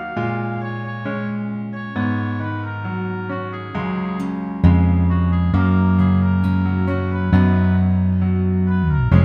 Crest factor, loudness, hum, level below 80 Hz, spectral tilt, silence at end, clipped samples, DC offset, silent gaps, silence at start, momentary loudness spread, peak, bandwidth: 16 dB; -19 LUFS; none; -32 dBFS; -10 dB/octave; 0 s; under 0.1%; under 0.1%; none; 0 s; 10 LU; 0 dBFS; 4.8 kHz